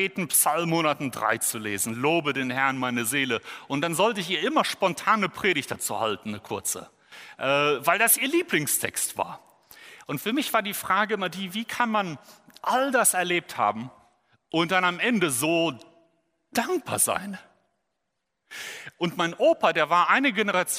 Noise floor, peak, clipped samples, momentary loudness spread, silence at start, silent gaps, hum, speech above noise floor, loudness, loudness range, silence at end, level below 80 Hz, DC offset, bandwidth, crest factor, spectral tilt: -81 dBFS; -6 dBFS; under 0.1%; 13 LU; 0 s; none; none; 55 dB; -24 LUFS; 3 LU; 0 s; -70 dBFS; under 0.1%; 16 kHz; 20 dB; -3 dB/octave